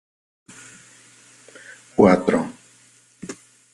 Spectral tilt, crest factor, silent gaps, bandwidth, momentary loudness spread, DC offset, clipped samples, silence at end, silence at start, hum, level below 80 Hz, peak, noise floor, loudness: -6.5 dB/octave; 24 dB; none; 11.5 kHz; 28 LU; under 0.1%; under 0.1%; 0.4 s; 2 s; none; -58 dBFS; 0 dBFS; -55 dBFS; -19 LUFS